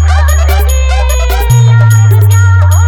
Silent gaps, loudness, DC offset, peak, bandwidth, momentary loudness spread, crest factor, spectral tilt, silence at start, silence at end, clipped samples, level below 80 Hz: none; -7 LUFS; under 0.1%; 0 dBFS; 18.5 kHz; 5 LU; 6 dB; -5 dB/octave; 0 s; 0 s; under 0.1%; -12 dBFS